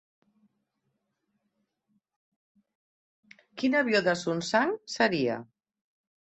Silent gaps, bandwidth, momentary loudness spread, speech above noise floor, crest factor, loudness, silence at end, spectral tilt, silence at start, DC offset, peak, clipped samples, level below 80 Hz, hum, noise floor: none; 8.2 kHz; 7 LU; 53 dB; 22 dB; -27 LUFS; 0.8 s; -4.5 dB/octave; 3.55 s; under 0.1%; -10 dBFS; under 0.1%; -74 dBFS; none; -79 dBFS